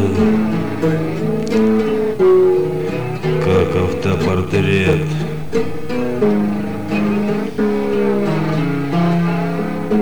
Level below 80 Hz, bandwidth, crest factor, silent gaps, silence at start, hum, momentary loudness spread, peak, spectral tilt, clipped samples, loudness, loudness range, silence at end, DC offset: -42 dBFS; over 20 kHz; 10 dB; none; 0 s; none; 6 LU; -6 dBFS; -7.5 dB/octave; under 0.1%; -17 LUFS; 2 LU; 0 s; 3%